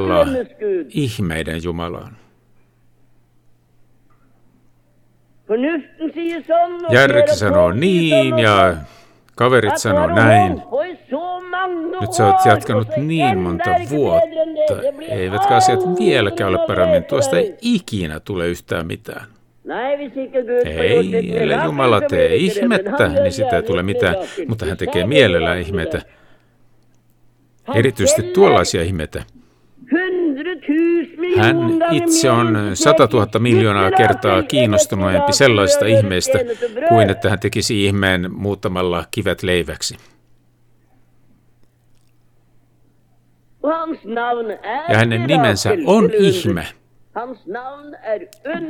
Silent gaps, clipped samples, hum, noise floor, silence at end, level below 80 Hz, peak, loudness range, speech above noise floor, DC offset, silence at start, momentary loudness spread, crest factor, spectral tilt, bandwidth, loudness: none; under 0.1%; none; -55 dBFS; 0 s; -44 dBFS; 0 dBFS; 11 LU; 39 dB; under 0.1%; 0 s; 12 LU; 16 dB; -5 dB/octave; 17.5 kHz; -16 LUFS